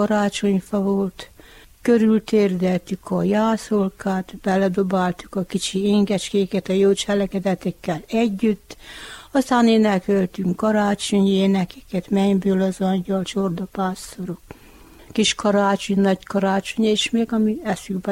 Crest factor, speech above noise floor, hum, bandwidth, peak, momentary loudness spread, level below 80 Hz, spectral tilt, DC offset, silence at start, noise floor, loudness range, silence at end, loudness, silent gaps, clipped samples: 16 dB; 27 dB; none; 15.5 kHz; -6 dBFS; 9 LU; -50 dBFS; -5.5 dB/octave; under 0.1%; 0 s; -47 dBFS; 3 LU; 0 s; -20 LUFS; none; under 0.1%